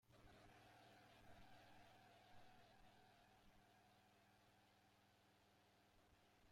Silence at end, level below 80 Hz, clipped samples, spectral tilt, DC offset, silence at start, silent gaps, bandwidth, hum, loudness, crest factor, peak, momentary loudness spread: 0 s; -82 dBFS; under 0.1%; -4 dB/octave; under 0.1%; 0 s; none; 16 kHz; none; -69 LUFS; 16 dB; -54 dBFS; 1 LU